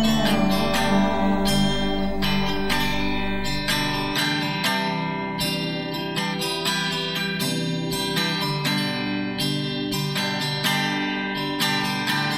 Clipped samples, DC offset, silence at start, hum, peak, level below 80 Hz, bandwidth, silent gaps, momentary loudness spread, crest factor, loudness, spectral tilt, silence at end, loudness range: under 0.1%; under 0.1%; 0 s; none; -8 dBFS; -40 dBFS; 16 kHz; none; 5 LU; 16 dB; -23 LUFS; -4 dB/octave; 0 s; 2 LU